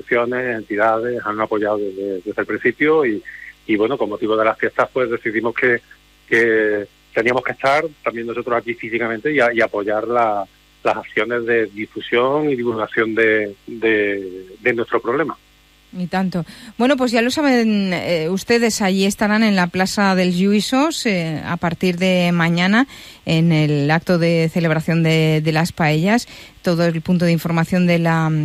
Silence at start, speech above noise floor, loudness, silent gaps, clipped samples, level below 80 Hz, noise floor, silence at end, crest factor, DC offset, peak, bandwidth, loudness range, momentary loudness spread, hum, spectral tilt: 0.05 s; 34 dB; -18 LUFS; none; under 0.1%; -54 dBFS; -51 dBFS; 0 s; 16 dB; under 0.1%; -2 dBFS; 15.5 kHz; 3 LU; 8 LU; none; -6 dB/octave